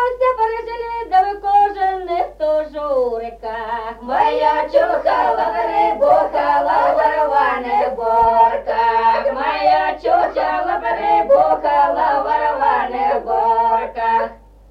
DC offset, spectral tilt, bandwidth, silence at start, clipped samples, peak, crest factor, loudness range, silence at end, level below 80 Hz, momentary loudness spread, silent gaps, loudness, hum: under 0.1%; -5.5 dB/octave; 6.6 kHz; 0 s; under 0.1%; -2 dBFS; 14 dB; 3 LU; 0.35 s; -44 dBFS; 7 LU; none; -16 LUFS; 50 Hz at -45 dBFS